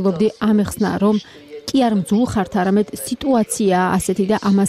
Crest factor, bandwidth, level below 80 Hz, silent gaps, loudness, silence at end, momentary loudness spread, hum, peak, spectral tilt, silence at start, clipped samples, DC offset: 12 dB; 14.5 kHz; -46 dBFS; none; -18 LUFS; 0 s; 6 LU; none; -6 dBFS; -6 dB/octave; 0 s; under 0.1%; under 0.1%